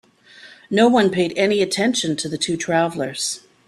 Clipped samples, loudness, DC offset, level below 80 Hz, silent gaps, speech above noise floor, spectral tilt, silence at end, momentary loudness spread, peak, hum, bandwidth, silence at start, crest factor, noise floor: under 0.1%; -19 LUFS; under 0.1%; -60 dBFS; none; 27 dB; -4 dB/octave; 0.3 s; 8 LU; -2 dBFS; none; 13 kHz; 0.45 s; 18 dB; -46 dBFS